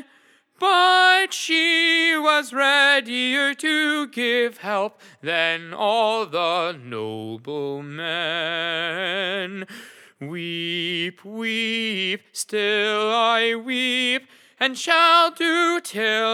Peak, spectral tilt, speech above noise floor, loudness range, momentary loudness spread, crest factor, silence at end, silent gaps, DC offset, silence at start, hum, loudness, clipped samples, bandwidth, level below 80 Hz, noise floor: -2 dBFS; -2.5 dB/octave; 35 dB; 9 LU; 14 LU; 20 dB; 0 s; none; under 0.1%; 0.6 s; none; -20 LUFS; under 0.1%; 17 kHz; under -90 dBFS; -57 dBFS